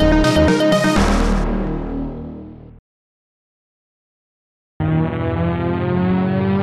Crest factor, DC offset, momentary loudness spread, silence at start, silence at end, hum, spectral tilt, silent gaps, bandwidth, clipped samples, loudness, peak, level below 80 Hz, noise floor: 16 dB; under 0.1%; 14 LU; 0 s; 0 s; none; -6.5 dB/octave; 2.79-4.80 s; 13.5 kHz; under 0.1%; -18 LUFS; -2 dBFS; -26 dBFS; under -90 dBFS